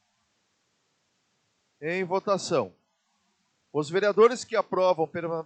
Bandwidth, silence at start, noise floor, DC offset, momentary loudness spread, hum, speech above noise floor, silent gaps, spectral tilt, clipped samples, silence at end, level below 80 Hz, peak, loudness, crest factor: 9 kHz; 1.8 s; -73 dBFS; under 0.1%; 12 LU; none; 48 dB; none; -5 dB/octave; under 0.1%; 0 s; -80 dBFS; -8 dBFS; -26 LUFS; 20 dB